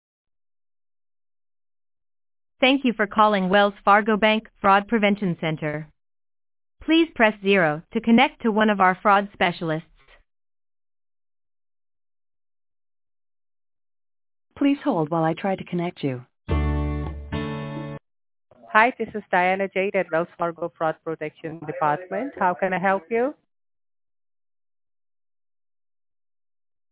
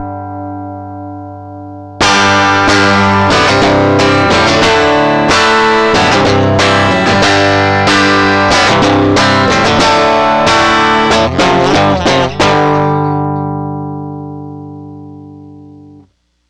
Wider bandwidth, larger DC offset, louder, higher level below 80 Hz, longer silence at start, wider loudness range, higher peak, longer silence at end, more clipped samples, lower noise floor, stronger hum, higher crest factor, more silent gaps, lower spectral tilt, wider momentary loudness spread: second, 4 kHz vs 12 kHz; neither; second, -22 LUFS vs -8 LUFS; second, -42 dBFS vs -34 dBFS; first, 2.6 s vs 0 s; first, 9 LU vs 6 LU; about the same, -2 dBFS vs -2 dBFS; first, 3.6 s vs 0.85 s; neither; first, under -90 dBFS vs -47 dBFS; second, none vs 60 Hz at -45 dBFS; first, 24 dB vs 8 dB; neither; first, -9.5 dB/octave vs -4.5 dB/octave; second, 13 LU vs 17 LU